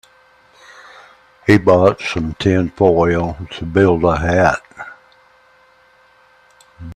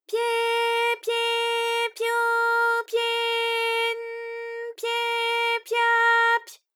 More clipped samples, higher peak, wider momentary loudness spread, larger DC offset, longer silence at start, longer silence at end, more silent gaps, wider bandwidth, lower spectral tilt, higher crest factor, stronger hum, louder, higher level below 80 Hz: neither; first, 0 dBFS vs -10 dBFS; first, 17 LU vs 11 LU; neither; first, 1.45 s vs 0.1 s; second, 0 s vs 0.2 s; neither; second, 11 kHz vs 18 kHz; first, -7 dB/octave vs 4 dB/octave; about the same, 18 dB vs 14 dB; neither; first, -15 LUFS vs -23 LUFS; first, -40 dBFS vs under -90 dBFS